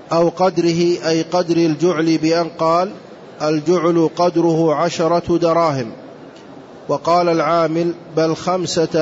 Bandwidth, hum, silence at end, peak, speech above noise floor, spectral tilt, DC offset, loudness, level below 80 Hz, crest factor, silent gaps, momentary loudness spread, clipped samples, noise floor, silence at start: 8 kHz; none; 0 s; -6 dBFS; 22 dB; -6 dB/octave; under 0.1%; -17 LUFS; -54 dBFS; 12 dB; none; 6 LU; under 0.1%; -38 dBFS; 0 s